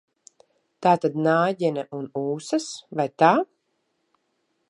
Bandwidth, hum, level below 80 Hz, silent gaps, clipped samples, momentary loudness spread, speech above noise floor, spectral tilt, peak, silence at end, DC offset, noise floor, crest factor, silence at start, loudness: 11 kHz; none; -76 dBFS; none; under 0.1%; 12 LU; 51 dB; -5.5 dB/octave; -2 dBFS; 1.25 s; under 0.1%; -73 dBFS; 22 dB; 0.8 s; -23 LUFS